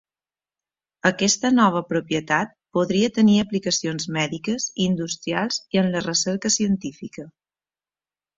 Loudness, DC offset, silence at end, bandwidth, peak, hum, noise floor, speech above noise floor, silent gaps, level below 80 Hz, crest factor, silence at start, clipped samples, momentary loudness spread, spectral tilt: -22 LUFS; under 0.1%; 1.1 s; 7.8 kHz; -4 dBFS; none; under -90 dBFS; over 68 dB; none; -60 dBFS; 20 dB; 1.05 s; under 0.1%; 8 LU; -4 dB/octave